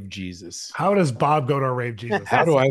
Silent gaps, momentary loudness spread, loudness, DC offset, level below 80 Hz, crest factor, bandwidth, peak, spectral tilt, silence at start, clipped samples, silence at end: none; 14 LU; -21 LUFS; under 0.1%; -60 dBFS; 18 dB; 12.5 kHz; -4 dBFS; -6 dB/octave; 0 s; under 0.1%; 0 s